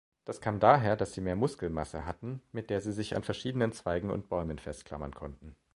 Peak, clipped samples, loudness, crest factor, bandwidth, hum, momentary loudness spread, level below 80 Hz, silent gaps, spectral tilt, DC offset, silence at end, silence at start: -6 dBFS; under 0.1%; -32 LUFS; 26 dB; 11.5 kHz; none; 16 LU; -52 dBFS; none; -6.5 dB/octave; under 0.1%; 0.2 s; 0.25 s